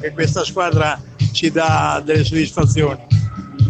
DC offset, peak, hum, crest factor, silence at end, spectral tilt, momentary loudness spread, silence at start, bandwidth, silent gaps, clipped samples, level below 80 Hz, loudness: under 0.1%; -2 dBFS; none; 14 dB; 0 s; -5.5 dB/octave; 4 LU; 0 s; 8.6 kHz; none; under 0.1%; -36 dBFS; -17 LUFS